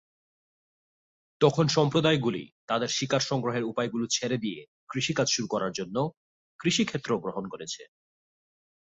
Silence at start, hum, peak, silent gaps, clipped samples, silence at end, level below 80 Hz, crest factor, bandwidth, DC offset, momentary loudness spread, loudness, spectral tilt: 1.4 s; none; -8 dBFS; 2.52-2.68 s, 4.68-4.87 s, 6.17-6.59 s; under 0.1%; 1.05 s; -66 dBFS; 22 dB; 8.2 kHz; under 0.1%; 13 LU; -28 LUFS; -4.5 dB/octave